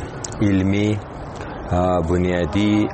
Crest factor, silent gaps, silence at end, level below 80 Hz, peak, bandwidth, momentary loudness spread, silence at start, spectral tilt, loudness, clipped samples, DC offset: 14 dB; none; 0 s; -38 dBFS; -6 dBFS; 8.8 kHz; 13 LU; 0 s; -6.5 dB/octave; -20 LUFS; under 0.1%; under 0.1%